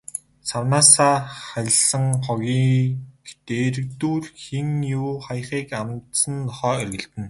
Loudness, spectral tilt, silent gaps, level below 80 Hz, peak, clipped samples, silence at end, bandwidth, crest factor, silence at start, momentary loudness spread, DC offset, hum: -20 LUFS; -4 dB/octave; none; -56 dBFS; 0 dBFS; under 0.1%; 0 s; 12 kHz; 22 dB; 0.15 s; 15 LU; under 0.1%; none